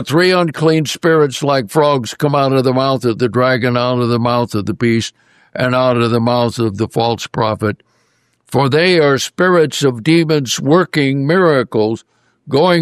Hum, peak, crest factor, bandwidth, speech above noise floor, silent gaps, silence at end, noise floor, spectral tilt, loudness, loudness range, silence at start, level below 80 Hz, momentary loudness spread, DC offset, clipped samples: none; -2 dBFS; 12 dB; 14 kHz; 46 dB; none; 0 s; -60 dBFS; -5.5 dB/octave; -14 LUFS; 3 LU; 0 s; -54 dBFS; 6 LU; under 0.1%; under 0.1%